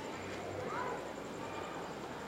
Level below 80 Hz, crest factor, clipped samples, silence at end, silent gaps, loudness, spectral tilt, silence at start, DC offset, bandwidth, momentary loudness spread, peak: -66 dBFS; 14 dB; under 0.1%; 0 s; none; -42 LUFS; -4.5 dB/octave; 0 s; under 0.1%; 16.5 kHz; 4 LU; -28 dBFS